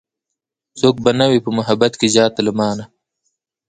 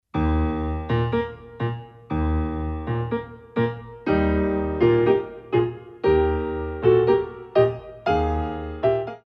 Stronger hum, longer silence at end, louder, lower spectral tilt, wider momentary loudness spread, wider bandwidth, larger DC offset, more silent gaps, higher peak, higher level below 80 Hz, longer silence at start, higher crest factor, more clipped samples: neither; first, 0.8 s vs 0.05 s; first, -15 LUFS vs -23 LUFS; second, -4.5 dB/octave vs -9.5 dB/octave; second, 6 LU vs 10 LU; first, 9.6 kHz vs 5.8 kHz; neither; neither; first, 0 dBFS vs -6 dBFS; second, -54 dBFS vs -34 dBFS; first, 0.75 s vs 0.15 s; about the same, 18 dB vs 16 dB; neither